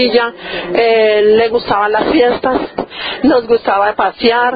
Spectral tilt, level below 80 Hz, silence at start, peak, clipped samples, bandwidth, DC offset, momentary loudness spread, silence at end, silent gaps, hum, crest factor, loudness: -8 dB/octave; -44 dBFS; 0 s; 0 dBFS; under 0.1%; 5 kHz; under 0.1%; 9 LU; 0 s; none; none; 12 dB; -12 LUFS